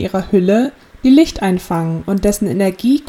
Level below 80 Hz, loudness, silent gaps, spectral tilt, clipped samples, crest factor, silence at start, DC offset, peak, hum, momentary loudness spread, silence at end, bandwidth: -36 dBFS; -15 LUFS; none; -6.5 dB/octave; under 0.1%; 14 dB; 0 s; under 0.1%; 0 dBFS; none; 8 LU; 0.05 s; 16.5 kHz